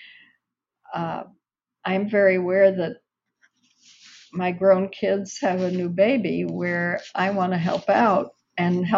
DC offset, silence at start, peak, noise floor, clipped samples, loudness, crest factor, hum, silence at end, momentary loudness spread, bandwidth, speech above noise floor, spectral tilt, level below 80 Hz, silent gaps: under 0.1%; 0 s; -6 dBFS; -77 dBFS; under 0.1%; -22 LUFS; 18 dB; none; 0 s; 12 LU; 7.6 kHz; 56 dB; -5.5 dB/octave; -68 dBFS; none